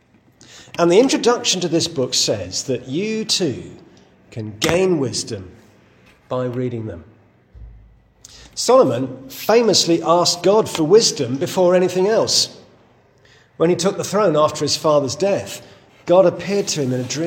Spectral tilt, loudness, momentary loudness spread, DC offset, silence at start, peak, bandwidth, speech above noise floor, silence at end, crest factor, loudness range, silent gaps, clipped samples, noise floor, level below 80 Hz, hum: -4 dB/octave; -17 LUFS; 15 LU; under 0.1%; 0.55 s; 0 dBFS; 17 kHz; 35 dB; 0 s; 18 dB; 8 LU; none; under 0.1%; -53 dBFS; -54 dBFS; none